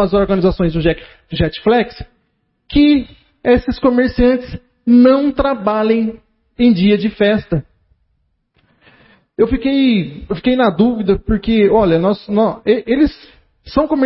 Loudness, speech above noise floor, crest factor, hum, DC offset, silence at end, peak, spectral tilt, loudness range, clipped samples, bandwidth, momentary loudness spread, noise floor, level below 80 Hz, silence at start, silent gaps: -14 LUFS; 51 dB; 14 dB; none; under 0.1%; 0 s; 0 dBFS; -11.5 dB/octave; 4 LU; under 0.1%; 5.8 kHz; 10 LU; -65 dBFS; -32 dBFS; 0 s; none